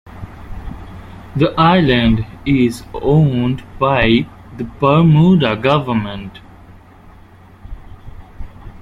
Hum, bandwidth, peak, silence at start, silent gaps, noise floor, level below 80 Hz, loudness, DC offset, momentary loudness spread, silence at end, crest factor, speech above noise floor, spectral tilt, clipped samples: none; 12 kHz; 0 dBFS; 0.05 s; none; -42 dBFS; -34 dBFS; -14 LUFS; under 0.1%; 23 LU; 0.05 s; 16 dB; 28 dB; -8 dB/octave; under 0.1%